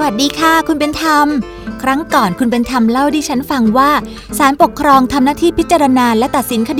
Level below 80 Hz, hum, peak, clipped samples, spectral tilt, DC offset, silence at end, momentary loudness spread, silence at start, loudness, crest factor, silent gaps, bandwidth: -36 dBFS; none; 0 dBFS; under 0.1%; -4 dB/octave; under 0.1%; 0 s; 6 LU; 0 s; -12 LUFS; 12 dB; none; 16.5 kHz